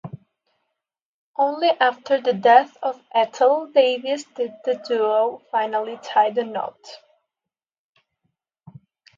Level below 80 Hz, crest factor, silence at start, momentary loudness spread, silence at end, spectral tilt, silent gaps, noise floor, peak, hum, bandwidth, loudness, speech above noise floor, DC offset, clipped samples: -76 dBFS; 22 dB; 0.05 s; 12 LU; 2.2 s; -4.5 dB/octave; 1.02-1.34 s; -88 dBFS; 0 dBFS; none; 7.6 kHz; -20 LUFS; 68 dB; under 0.1%; under 0.1%